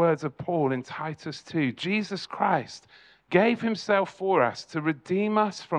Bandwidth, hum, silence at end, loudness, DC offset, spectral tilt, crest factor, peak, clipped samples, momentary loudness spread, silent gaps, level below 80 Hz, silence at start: 10 kHz; none; 0 s; -27 LUFS; under 0.1%; -6 dB/octave; 20 dB; -8 dBFS; under 0.1%; 10 LU; none; -70 dBFS; 0 s